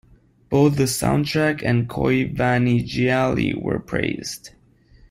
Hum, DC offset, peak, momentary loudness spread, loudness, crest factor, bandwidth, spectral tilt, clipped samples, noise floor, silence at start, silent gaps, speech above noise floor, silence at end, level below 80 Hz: none; under 0.1%; -4 dBFS; 7 LU; -20 LUFS; 16 dB; 16 kHz; -6 dB/octave; under 0.1%; -52 dBFS; 0.5 s; none; 32 dB; 0.65 s; -44 dBFS